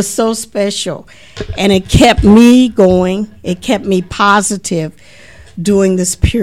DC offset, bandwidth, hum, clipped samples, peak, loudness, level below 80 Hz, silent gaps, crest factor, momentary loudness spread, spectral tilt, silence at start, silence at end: 0.8%; 15.5 kHz; none; 0.7%; 0 dBFS; -11 LUFS; -26 dBFS; none; 12 dB; 15 LU; -5 dB/octave; 0 s; 0 s